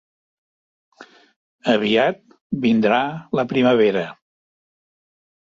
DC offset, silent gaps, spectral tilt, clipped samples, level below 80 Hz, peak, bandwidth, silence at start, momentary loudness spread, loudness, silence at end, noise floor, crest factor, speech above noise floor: under 0.1%; 1.36-1.59 s, 2.41-2.50 s; -6.5 dB/octave; under 0.1%; -62 dBFS; -4 dBFS; 7.4 kHz; 1 s; 12 LU; -19 LUFS; 1.3 s; under -90 dBFS; 18 dB; over 72 dB